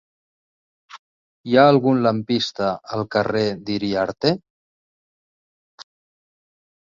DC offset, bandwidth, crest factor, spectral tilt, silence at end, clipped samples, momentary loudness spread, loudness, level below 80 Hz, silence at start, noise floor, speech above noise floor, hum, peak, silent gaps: under 0.1%; 7.6 kHz; 22 dB; -6.5 dB/octave; 1 s; under 0.1%; 11 LU; -20 LUFS; -60 dBFS; 0.95 s; under -90 dBFS; over 71 dB; none; -2 dBFS; 0.99-1.44 s, 4.50-5.78 s